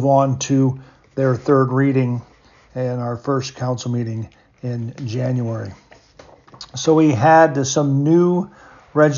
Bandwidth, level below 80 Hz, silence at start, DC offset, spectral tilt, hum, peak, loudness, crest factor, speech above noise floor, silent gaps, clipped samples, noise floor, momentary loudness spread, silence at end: 7.4 kHz; -56 dBFS; 0 s; under 0.1%; -6.5 dB/octave; none; -2 dBFS; -18 LUFS; 16 dB; 30 dB; none; under 0.1%; -47 dBFS; 18 LU; 0 s